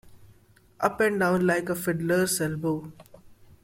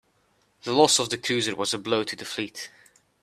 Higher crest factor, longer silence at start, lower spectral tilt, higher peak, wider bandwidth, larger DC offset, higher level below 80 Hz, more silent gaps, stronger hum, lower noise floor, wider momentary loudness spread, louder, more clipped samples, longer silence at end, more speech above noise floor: about the same, 20 dB vs 22 dB; second, 0.05 s vs 0.65 s; first, -5 dB/octave vs -2.5 dB/octave; second, -8 dBFS vs -4 dBFS; about the same, 16.5 kHz vs 15.5 kHz; neither; first, -58 dBFS vs -68 dBFS; neither; neither; second, -58 dBFS vs -67 dBFS; second, 7 LU vs 18 LU; about the same, -26 LUFS vs -24 LUFS; neither; second, 0.3 s vs 0.55 s; second, 32 dB vs 42 dB